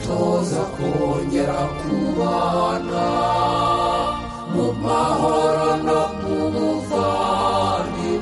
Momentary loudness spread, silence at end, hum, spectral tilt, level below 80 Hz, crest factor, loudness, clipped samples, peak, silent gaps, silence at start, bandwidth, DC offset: 5 LU; 0 s; none; -6 dB/octave; -40 dBFS; 12 dB; -20 LUFS; under 0.1%; -8 dBFS; none; 0 s; 11.5 kHz; under 0.1%